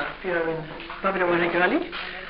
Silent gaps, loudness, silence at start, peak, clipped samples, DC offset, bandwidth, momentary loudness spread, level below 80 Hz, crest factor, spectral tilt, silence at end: none; -24 LUFS; 0 s; -8 dBFS; under 0.1%; under 0.1%; 5.4 kHz; 11 LU; -48 dBFS; 18 dB; -3 dB/octave; 0 s